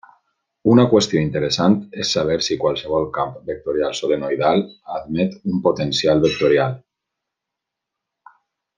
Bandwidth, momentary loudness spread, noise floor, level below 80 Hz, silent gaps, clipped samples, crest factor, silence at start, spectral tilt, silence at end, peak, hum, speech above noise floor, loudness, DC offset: 9.8 kHz; 9 LU; -83 dBFS; -52 dBFS; none; under 0.1%; 18 dB; 0.65 s; -5.5 dB/octave; 2 s; -2 dBFS; none; 65 dB; -19 LUFS; under 0.1%